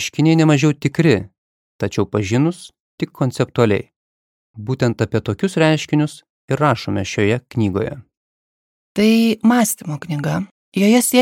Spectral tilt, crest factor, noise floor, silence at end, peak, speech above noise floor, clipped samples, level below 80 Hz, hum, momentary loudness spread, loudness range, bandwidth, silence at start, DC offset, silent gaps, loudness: -5.5 dB/octave; 18 dB; under -90 dBFS; 0 s; 0 dBFS; over 73 dB; under 0.1%; -54 dBFS; none; 12 LU; 3 LU; 17.5 kHz; 0 s; under 0.1%; 1.38-1.79 s, 2.80-2.98 s, 3.96-4.54 s, 6.30-6.48 s, 8.17-8.95 s, 10.51-10.72 s; -18 LUFS